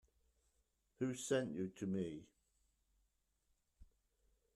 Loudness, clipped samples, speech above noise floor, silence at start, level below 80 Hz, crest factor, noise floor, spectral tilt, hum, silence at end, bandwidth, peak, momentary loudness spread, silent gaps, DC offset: -43 LUFS; under 0.1%; 41 dB; 1 s; -76 dBFS; 22 dB; -83 dBFS; -5.5 dB/octave; none; 0.7 s; 13 kHz; -26 dBFS; 7 LU; none; under 0.1%